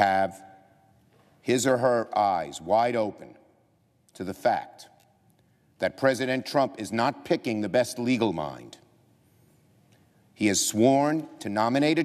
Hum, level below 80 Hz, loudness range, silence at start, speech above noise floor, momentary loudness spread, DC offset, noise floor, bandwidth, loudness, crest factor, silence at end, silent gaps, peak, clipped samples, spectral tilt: none; -70 dBFS; 4 LU; 0 s; 40 dB; 10 LU; under 0.1%; -66 dBFS; 14.5 kHz; -26 LUFS; 20 dB; 0 s; none; -6 dBFS; under 0.1%; -4.5 dB/octave